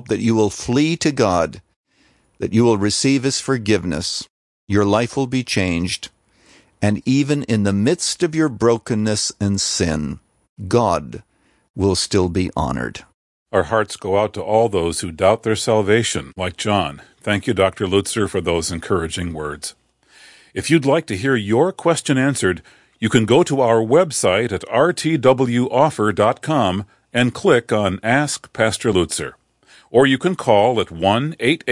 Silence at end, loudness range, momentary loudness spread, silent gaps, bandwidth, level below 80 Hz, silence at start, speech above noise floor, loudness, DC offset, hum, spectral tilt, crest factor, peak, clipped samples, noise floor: 0 s; 4 LU; 9 LU; 1.76-1.84 s, 4.30-4.67 s, 10.49-10.57 s, 11.70-11.74 s, 13.14-13.46 s; 11.5 kHz; -48 dBFS; 0.05 s; 41 dB; -18 LUFS; under 0.1%; none; -5 dB/octave; 16 dB; -2 dBFS; under 0.1%; -59 dBFS